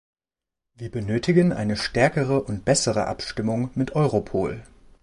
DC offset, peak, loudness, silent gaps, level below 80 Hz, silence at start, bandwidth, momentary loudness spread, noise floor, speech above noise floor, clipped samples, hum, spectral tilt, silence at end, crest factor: under 0.1%; -6 dBFS; -23 LUFS; none; -48 dBFS; 0.8 s; 11.5 kHz; 10 LU; -89 dBFS; 66 dB; under 0.1%; none; -5.5 dB/octave; 0.4 s; 18 dB